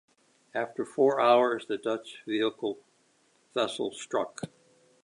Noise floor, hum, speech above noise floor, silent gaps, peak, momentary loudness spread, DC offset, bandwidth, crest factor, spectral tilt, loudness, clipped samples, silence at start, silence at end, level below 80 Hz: -67 dBFS; none; 39 dB; none; -10 dBFS; 15 LU; under 0.1%; 11.5 kHz; 20 dB; -4.5 dB/octave; -29 LUFS; under 0.1%; 0.55 s; 0.6 s; -80 dBFS